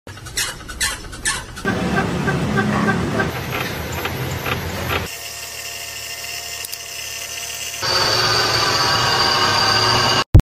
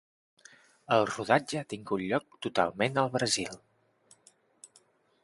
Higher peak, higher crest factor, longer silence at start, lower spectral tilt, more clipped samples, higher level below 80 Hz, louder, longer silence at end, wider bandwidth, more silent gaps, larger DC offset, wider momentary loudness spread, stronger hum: first, 0 dBFS vs -8 dBFS; second, 20 dB vs 26 dB; second, 0.05 s vs 0.9 s; about the same, -3.5 dB/octave vs -4 dB/octave; neither; first, -34 dBFS vs -68 dBFS; first, -19 LUFS vs -30 LUFS; second, 0 s vs 0.55 s; first, 16 kHz vs 11.5 kHz; first, 10.26-10.33 s vs none; neither; first, 12 LU vs 9 LU; neither